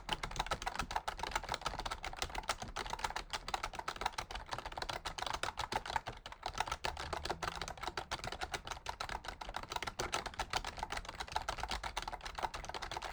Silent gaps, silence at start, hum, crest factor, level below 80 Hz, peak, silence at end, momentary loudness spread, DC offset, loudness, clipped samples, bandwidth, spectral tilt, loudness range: none; 0 s; none; 24 dB; -52 dBFS; -18 dBFS; 0 s; 4 LU; under 0.1%; -41 LUFS; under 0.1%; over 20 kHz; -2.5 dB/octave; 1 LU